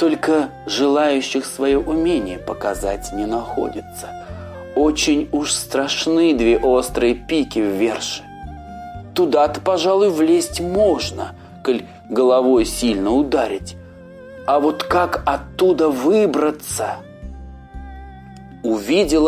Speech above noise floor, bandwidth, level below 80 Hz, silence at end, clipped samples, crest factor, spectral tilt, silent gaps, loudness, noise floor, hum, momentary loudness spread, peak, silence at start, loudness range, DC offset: 21 dB; 16 kHz; -38 dBFS; 0 s; under 0.1%; 16 dB; -4 dB/octave; none; -18 LUFS; -39 dBFS; none; 19 LU; -4 dBFS; 0 s; 4 LU; under 0.1%